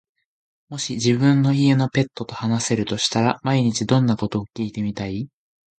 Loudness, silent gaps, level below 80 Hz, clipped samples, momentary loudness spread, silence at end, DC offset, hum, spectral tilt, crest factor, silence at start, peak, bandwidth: -21 LUFS; none; -54 dBFS; under 0.1%; 12 LU; 0.5 s; under 0.1%; none; -5.5 dB/octave; 18 dB; 0.7 s; -2 dBFS; 9.2 kHz